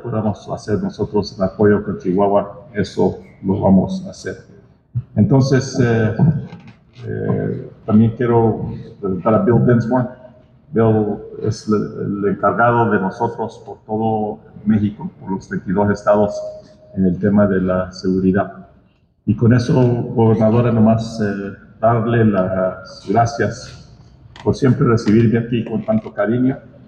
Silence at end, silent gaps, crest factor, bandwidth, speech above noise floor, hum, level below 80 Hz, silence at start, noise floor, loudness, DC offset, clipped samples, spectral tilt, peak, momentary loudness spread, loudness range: 0.3 s; none; 14 dB; 8.6 kHz; 38 dB; none; -46 dBFS; 0 s; -54 dBFS; -17 LUFS; under 0.1%; under 0.1%; -8 dB/octave; -4 dBFS; 13 LU; 3 LU